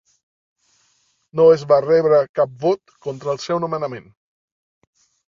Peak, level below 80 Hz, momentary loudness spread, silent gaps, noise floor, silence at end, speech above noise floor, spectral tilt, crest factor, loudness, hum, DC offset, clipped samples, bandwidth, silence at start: -2 dBFS; -64 dBFS; 15 LU; 2.29-2.34 s; -64 dBFS; 1.3 s; 46 dB; -6.5 dB/octave; 18 dB; -18 LUFS; none; under 0.1%; under 0.1%; 7.4 kHz; 1.35 s